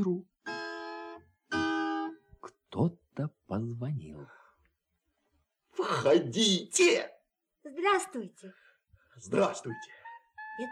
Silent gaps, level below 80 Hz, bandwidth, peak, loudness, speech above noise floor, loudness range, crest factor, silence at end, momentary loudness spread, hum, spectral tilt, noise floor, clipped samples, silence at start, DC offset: none; -70 dBFS; 13 kHz; -14 dBFS; -31 LUFS; 50 dB; 9 LU; 20 dB; 0 s; 22 LU; none; -4 dB/octave; -80 dBFS; under 0.1%; 0 s; under 0.1%